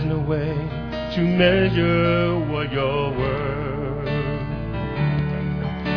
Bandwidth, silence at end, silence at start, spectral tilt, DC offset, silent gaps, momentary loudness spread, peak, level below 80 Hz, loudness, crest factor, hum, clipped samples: 5.4 kHz; 0 s; 0 s; -9 dB/octave; 0.3%; none; 10 LU; -4 dBFS; -36 dBFS; -22 LUFS; 18 dB; none; under 0.1%